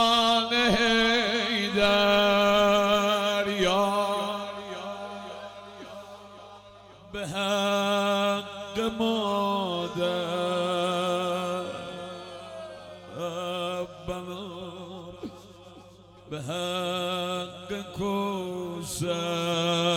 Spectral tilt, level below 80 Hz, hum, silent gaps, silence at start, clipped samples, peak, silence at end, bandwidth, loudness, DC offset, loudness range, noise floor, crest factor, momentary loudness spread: -4 dB/octave; -54 dBFS; none; none; 0 s; under 0.1%; -10 dBFS; 0 s; 18 kHz; -26 LUFS; under 0.1%; 13 LU; -51 dBFS; 18 dB; 20 LU